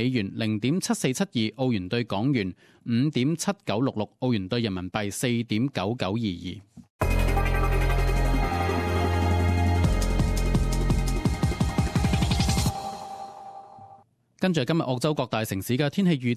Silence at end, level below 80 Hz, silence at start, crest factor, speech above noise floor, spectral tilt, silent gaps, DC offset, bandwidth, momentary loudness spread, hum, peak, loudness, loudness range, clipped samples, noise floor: 0 s; -30 dBFS; 0 s; 16 dB; 29 dB; -6 dB/octave; 6.90-6.99 s; under 0.1%; 14.5 kHz; 7 LU; none; -8 dBFS; -26 LUFS; 3 LU; under 0.1%; -55 dBFS